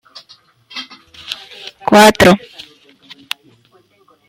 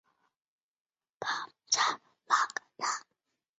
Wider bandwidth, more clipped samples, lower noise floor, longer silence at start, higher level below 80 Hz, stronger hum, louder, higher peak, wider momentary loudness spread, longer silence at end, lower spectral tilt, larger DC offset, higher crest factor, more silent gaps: first, 16.5 kHz vs 8 kHz; neither; second, -53 dBFS vs -84 dBFS; second, 0.75 s vs 1.2 s; first, -46 dBFS vs -86 dBFS; neither; first, -10 LUFS vs -32 LUFS; first, 0 dBFS vs -12 dBFS; first, 26 LU vs 11 LU; first, 1.9 s vs 0.6 s; first, -4 dB/octave vs 3 dB/octave; neither; second, 16 dB vs 24 dB; neither